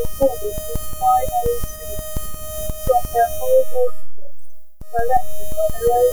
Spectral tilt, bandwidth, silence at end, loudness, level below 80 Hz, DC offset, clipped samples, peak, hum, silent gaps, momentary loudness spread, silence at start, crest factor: -4.5 dB/octave; over 20 kHz; 0 s; -21 LUFS; -32 dBFS; under 0.1%; under 0.1%; -4 dBFS; none; none; 12 LU; 0 s; 12 dB